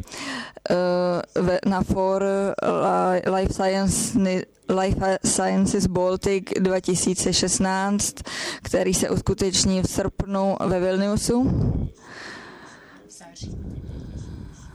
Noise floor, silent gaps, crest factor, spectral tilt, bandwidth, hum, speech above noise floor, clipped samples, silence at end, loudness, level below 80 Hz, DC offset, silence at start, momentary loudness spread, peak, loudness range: -46 dBFS; none; 16 dB; -4.5 dB/octave; 14.5 kHz; none; 24 dB; under 0.1%; 0.05 s; -22 LUFS; -40 dBFS; under 0.1%; 0 s; 16 LU; -8 dBFS; 4 LU